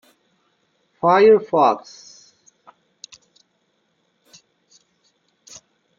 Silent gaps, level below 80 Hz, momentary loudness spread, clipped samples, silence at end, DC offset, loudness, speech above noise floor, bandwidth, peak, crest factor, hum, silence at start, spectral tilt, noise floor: none; -68 dBFS; 30 LU; under 0.1%; 4.2 s; under 0.1%; -16 LUFS; 53 dB; 7.4 kHz; -2 dBFS; 20 dB; none; 1.05 s; -5.5 dB/octave; -68 dBFS